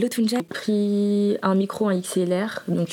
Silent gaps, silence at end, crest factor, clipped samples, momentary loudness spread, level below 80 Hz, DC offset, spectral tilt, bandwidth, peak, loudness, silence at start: none; 0 s; 16 dB; under 0.1%; 5 LU; -72 dBFS; under 0.1%; -6 dB/octave; 17.5 kHz; -6 dBFS; -23 LUFS; 0 s